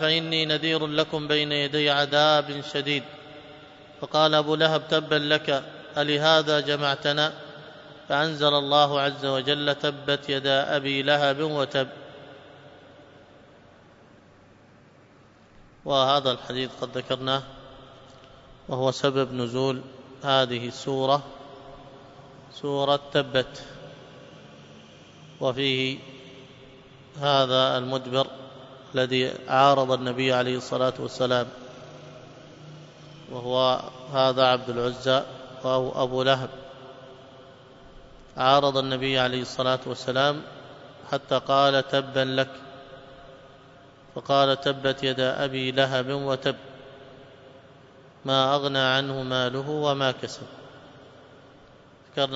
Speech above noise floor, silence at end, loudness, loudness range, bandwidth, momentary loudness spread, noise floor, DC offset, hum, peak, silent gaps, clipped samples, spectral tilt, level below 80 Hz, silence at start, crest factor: 30 dB; 0 s; -24 LUFS; 6 LU; 8 kHz; 23 LU; -54 dBFS; under 0.1%; none; -4 dBFS; none; under 0.1%; -5 dB/octave; -62 dBFS; 0 s; 22 dB